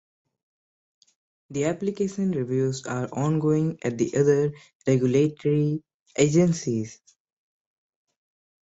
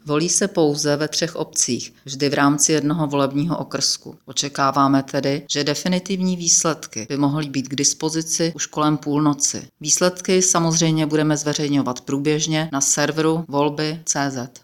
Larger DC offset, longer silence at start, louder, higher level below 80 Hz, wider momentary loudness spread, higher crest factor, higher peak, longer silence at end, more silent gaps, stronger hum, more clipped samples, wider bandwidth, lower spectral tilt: neither; first, 1.5 s vs 0.05 s; second, -25 LUFS vs -19 LUFS; about the same, -62 dBFS vs -62 dBFS; about the same, 9 LU vs 8 LU; about the same, 18 dB vs 16 dB; about the same, -6 dBFS vs -4 dBFS; first, 1.7 s vs 0.05 s; first, 4.75-4.80 s, 5.94-6.06 s vs none; neither; neither; second, 8.2 kHz vs 17 kHz; first, -6.5 dB/octave vs -3.5 dB/octave